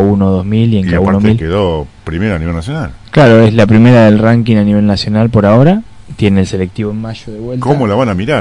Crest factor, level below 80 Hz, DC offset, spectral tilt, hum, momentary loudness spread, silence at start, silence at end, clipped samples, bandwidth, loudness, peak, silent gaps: 10 dB; -34 dBFS; under 0.1%; -8 dB/octave; none; 13 LU; 0 s; 0 s; 3%; 10.5 kHz; -10 LUFS; 0 dBFS; none